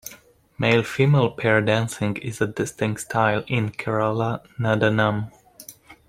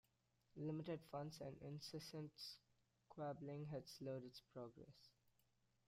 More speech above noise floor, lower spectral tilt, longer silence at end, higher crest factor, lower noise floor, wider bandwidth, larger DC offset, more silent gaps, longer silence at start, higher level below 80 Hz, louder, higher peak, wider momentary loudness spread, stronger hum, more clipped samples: about the same, 29 dB vs 31 dB; about the same, -6 dB/octave vs -6 dB/octave; second, 0.15 s vs 0.75 s; about the same, 18 dB vs 16 dB; second, -50 dBFS vs -84 dBFS; about the same, 16 kHz vs 16 kHz; neither; neither; second, 0.05 s vs 0.55 s; first, -56 dBFS vs -84 dBFS; first, -22 LUFS vs -53 LUFS; first, -4 dBFS vs -38 dBFS; first, 15 LU vs 12 LU; neither; neither